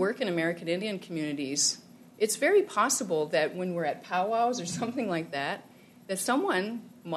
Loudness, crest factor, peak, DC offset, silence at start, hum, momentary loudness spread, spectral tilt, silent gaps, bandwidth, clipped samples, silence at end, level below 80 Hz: -29 LUFS; 18 dB; -12 dBFS; under 0.1%; 0 s; none; 9 LU; -3 dB/octave; none; 13.5 kHz; under 0.1%; 0 s; -80 dBFS